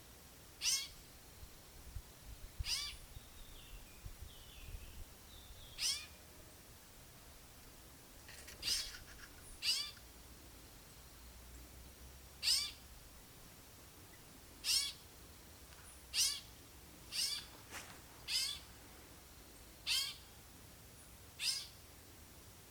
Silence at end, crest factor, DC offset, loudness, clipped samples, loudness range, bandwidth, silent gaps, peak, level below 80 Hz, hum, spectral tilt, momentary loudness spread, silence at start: 0 s; 26 dB; under 0.1%; -39 LUFS; under 0.1%; 8 LU; over 20 kHz; none; -20 dBFS; -60 dBFS; none; 0 dB/octave; 21 LU; 0 s